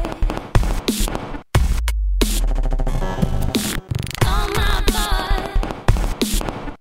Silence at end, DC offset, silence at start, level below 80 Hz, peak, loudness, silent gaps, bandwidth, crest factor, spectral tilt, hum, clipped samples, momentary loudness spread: 0.05 s; under 0.1%; 0 s; -20 dBFS; 0 dBFS; -22 LUFS; none; 16.5 kHz; 18 dB; -4.5 dB/octave; none; under 0.1%; 5 LU